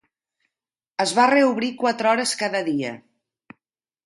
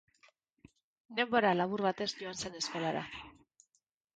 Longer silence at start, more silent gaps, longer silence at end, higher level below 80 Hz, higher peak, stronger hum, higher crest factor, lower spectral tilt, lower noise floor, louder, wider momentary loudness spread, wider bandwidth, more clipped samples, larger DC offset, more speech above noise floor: about the same, 1 s vs 1.1 s; neither; first, 1.05 s vs 0.85 s; about the same, -72 dBFS vs -70 dBFS; first, -4 dBFS vs -16 dBFS; neither; about the same, 18 dB vs 20 dB; about the same, -3 dB/octave vs -4 dB/octave; first, -89 dBFS vs -80 dBFS; first, -20 LUFS vs -34 LUFS; about the same, 14 LU vs 15 LU; first, 11.5 kHz vs 9.4 kHz; neither; neither; first, 69 dB vs 46 dB